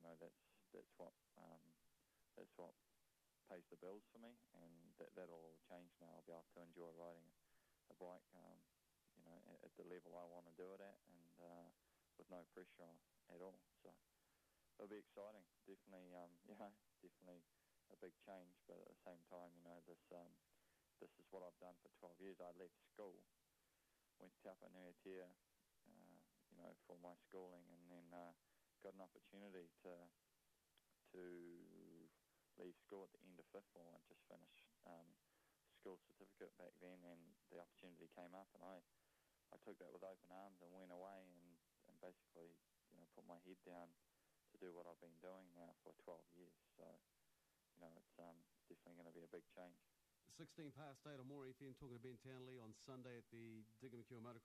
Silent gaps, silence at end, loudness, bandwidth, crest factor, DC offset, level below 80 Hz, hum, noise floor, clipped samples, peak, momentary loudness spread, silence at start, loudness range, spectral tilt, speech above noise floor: none; 0 s; -64 LUFS; 13.5 kHz; 16 dB; under 0.1%; under -90 dBFS; none; -85 dBFS; under 0.1%; -48 dBFS; 8 LU; 0 s; 5 LU; -6 dB/octave; 23 dB